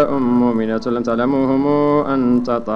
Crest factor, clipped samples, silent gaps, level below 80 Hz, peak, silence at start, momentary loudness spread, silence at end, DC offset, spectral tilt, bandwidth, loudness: 12 dB; under 0.1%; none; -46 dBFS; -4 dBFS; 0 s; 4 LU; 0 s; under 0.1%; -8.5 dB/octave; 6.8 kHz; -17 LUFS